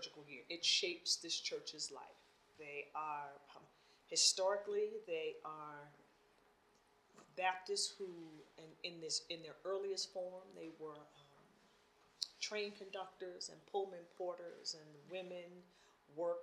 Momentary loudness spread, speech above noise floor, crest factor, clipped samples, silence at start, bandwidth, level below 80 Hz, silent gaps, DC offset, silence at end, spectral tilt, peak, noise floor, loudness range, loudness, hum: 20 LU; 29 dB; 26 dB; under 0.1%; 0 s; 14 kHz; -90 dBFS; none; under 0.1%; 0 s; -0.5 dB/octave; -18 dBFS; -73 dBFS; 8 LU; -42 LUFS; none